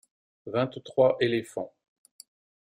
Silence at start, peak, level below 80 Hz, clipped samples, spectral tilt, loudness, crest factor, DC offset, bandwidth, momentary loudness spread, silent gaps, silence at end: 0.45 s; -10 dBFS; -70 dBFS; under 0.1%; -6 dB/octave; -27 LUFS; 20 dB; under 0.1%; 14.5 kHz; 17 LU; none; 1.05 s